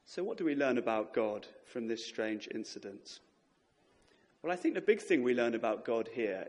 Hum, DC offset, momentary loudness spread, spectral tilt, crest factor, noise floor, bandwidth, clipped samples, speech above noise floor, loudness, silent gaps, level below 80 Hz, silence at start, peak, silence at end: none; under 0.1%; 15 LU; -5 dB/octave; 20 dB; -73 dBFS; 11 kHz; under 0.1%; 38 dB; -35 LUFS; none; -82 dBFS; 0.1 s; -14 dBFS; 0 s